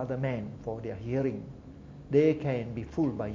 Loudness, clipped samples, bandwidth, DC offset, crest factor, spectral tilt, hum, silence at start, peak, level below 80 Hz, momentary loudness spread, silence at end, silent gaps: -31 LUFS; under 0.1%; 7.4 kHz; under 0.1%; 20 dB; -9 dB/octave; none; 0 s; -12 dBFS; -52 dBFS; 21 LU; 0 s; none